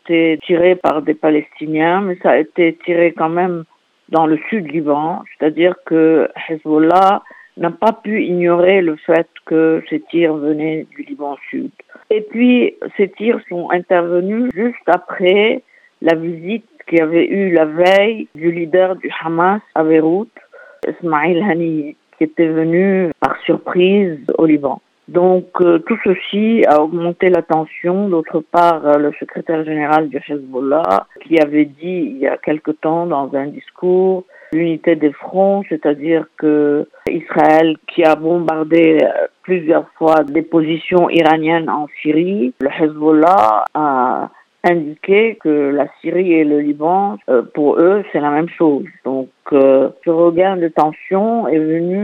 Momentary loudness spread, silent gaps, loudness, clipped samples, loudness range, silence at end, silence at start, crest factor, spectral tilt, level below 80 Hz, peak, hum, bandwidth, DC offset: 9 LU; none; -15 LUFS; under 0.1%; 3 LU; 0 s; 0.05 s; 14 dB; -8 dB/octave; -62 dBFS; 0 dBFS; none; 6.2 kHz; under 0.1%